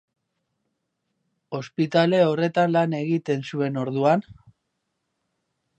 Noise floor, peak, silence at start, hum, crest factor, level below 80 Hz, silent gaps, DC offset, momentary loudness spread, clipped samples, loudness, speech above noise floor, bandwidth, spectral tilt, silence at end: -77 dBFS; -4 dBFS; 1.5 s; none; 22 dB; -68 dBFS; none; under 0.1%; 8 LU; under 0.1%; -22 LUFS; 55 dB; 8.6 kHz; -7.5 dB/octave; 1.45 s